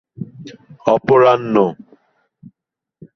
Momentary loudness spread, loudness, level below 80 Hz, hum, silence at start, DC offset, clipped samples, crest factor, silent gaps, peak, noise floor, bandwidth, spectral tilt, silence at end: 21 LU; -14 LUFS; -58 dBFS; none; 0.2 s; under 0.1%; under 0.1%; 18 dB; none; 0 dBFS; -82 dBFS; 6.4 kHz; -7.5 dB/octave; 1.4 s